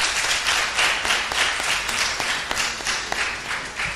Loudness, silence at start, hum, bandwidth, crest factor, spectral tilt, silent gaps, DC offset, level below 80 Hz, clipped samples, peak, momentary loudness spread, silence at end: -21 LUFS; 0 s; none; 15.5 kHz; 16 dB; 0.5 dB/octave; none; under 0.1%; -46 dBFS; under 0.1%; -8 dBFS; 5 LU; 0 s